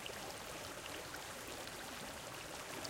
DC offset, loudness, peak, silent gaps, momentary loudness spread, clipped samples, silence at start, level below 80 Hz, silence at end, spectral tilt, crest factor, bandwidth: under 0.1%; -47 LUFS; -28 dBFS; none; 1 LU; under 0.1%; 0 s; -66 dBFS; 0 s; -2 dB/octave; 20 dB; 17 kHz